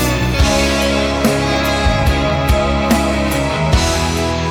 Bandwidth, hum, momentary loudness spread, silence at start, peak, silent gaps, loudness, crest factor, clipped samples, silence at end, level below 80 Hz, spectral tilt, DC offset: 19 kHz; none; 2 LU; 0 s; 0 dBFS; none; -15 LUFS; 14 dB; under 0.1%; 0 s; -20 dBFS; -5 dB/octave; under 0.1%